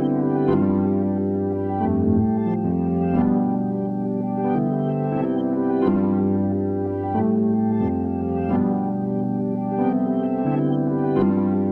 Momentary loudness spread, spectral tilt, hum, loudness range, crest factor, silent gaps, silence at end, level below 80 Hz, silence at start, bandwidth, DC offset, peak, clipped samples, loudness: 4 LU; -12 dB/octave; none; 1 LU; 14 dB; none; 0 s; -50 dBFS; 0 s; 4.2 kHz; under 0.1%; -8 dBFS; under 0.1%; -22 LUFS